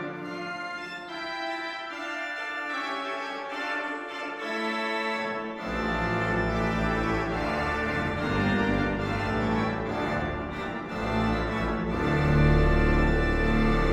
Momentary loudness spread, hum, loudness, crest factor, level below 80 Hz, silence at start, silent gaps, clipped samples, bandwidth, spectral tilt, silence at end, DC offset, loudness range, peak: 10 LU; none; -28 LUFS; 16 dB; -34 dBFS; 0 s; none; under 0.1%; 12 kHz; -6.5 dB/octave; 0 s; under 0.1%; 6 LU; -10 dBFS